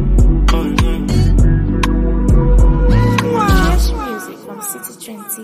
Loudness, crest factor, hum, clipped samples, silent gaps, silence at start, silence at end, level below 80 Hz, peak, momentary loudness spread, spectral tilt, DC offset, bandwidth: -15 LUFS; 12 dB; none; under 0.1%; none; 0 s; 0 s; -14 dBFS; 0 dBFS; 13 LU; -6 dB/octave; under 0.1%; 15.5 kHz